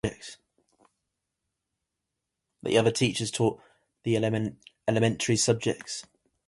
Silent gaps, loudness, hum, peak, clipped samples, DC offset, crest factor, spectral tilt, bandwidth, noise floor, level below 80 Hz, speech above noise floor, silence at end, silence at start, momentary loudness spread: none; -27 LUFS; none; -8 dBFS; under 0.1%; under 0.1%; 22 dB; -4.5 dB/octave; 11.5 kHz; -85 dBFS; -60 dBFS; 58 dB; 0.45 s; 0.05 s; 14 LU